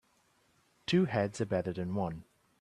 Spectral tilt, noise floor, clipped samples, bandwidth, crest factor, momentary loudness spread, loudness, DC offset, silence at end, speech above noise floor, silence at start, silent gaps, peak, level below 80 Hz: -6.5 dB/octave; -71 dBFS; under 0.1%; 10.5 kHz; 18 dB; 12 LU; -33 LUFS; under 0.1%; 0.4 s; 39 dB; 0.9 s; none; -16 dBFS; -66 dBFS